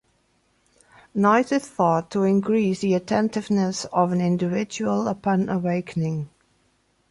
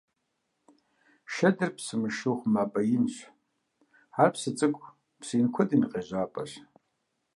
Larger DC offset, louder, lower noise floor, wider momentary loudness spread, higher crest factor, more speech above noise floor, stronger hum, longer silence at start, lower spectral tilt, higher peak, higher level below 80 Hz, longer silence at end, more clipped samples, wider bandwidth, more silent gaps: neither; first, -23 LUFS vs -28 LUFS; second, -66 dBFS vs -79 dBFS; second, 6 LU vs 14 LU; about the same, 18 dB vs 22 dB; second, 44 dB vs 52 dB; neither; second, 1.15 s vs 1.3 s; about the same, -6.5 dB/octave vs -6 dB/octave; about the same, -6 dBFS vs -8 dBFS; first, -62 dBFS vs -72 dBFS; about the same, 0.85 s vs 0.75 s; neither; about the same, 11.5 kHz vs 11.5 kHz; neither